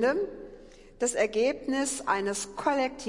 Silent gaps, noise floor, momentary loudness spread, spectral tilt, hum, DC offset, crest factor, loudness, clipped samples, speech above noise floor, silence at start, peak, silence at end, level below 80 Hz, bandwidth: none; -50 dBFS; 8 LU; -2.5 dB/octave; none; under 0.1%; 18 dB; -29 LUFS; under 0.1%; 22 dB; 0 s; -12 dBFS; 0 s; -56 dBFS; 11.5 kHz